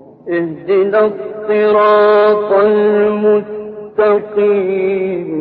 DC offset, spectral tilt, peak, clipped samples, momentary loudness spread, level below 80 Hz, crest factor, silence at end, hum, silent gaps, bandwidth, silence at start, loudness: under 0.1%; -9.5 dB/octave; -2 dBFS; under 0.1%; 10 LU; -58 dBFS; 10 dB; 0 s; none; none; 4.8 kHz; 0.25 s; -13 LUFS